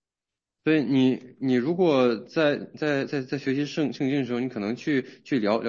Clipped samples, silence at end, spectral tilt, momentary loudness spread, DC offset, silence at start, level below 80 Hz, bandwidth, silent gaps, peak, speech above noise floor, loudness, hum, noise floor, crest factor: under 0.1%; 0 s; -7 dB/octave; 8 LU; under 0.1%; 0.65 s; -74 dBFS; 7.2 kHz; none; -10 dBFS; 65 dB; -25 LUFS; none; -89 dBFS; 16 dB